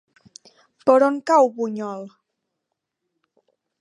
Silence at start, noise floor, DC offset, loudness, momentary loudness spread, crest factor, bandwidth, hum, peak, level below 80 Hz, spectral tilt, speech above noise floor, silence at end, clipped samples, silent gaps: 0.85 s; -80 dBFS; under 0.1%; -19 LUFS; 17 LU; 22 dB; 10.5 kHz; none; -2 dBFS; -78 dBFS; -5.5 dB/octave; 62 dB; 1.75 s; under 0.1%; none